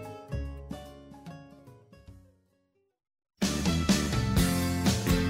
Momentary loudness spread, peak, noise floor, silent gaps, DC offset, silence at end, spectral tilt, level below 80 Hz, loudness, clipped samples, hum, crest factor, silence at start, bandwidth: 21 LU; -12 dBFS; -73 dBFS; none; under 0.1%; 0 s; -5 dB/octave; -40 dBFS; -28 LUFS; under 0.1%; none; 18 dB; 0 s; 16 kHz